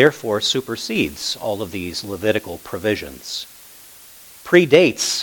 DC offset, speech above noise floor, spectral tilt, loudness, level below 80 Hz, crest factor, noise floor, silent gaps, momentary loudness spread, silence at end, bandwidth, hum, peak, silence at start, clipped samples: under 0.1%; 24 dB; -3.5 dB/octave; -19 LUFS; -52 dBFS; 20 dB; -43 dBFS; none; 23 LU; 0 s; 19 kHz; none; 0 dBFS; 0 s; under 0.1%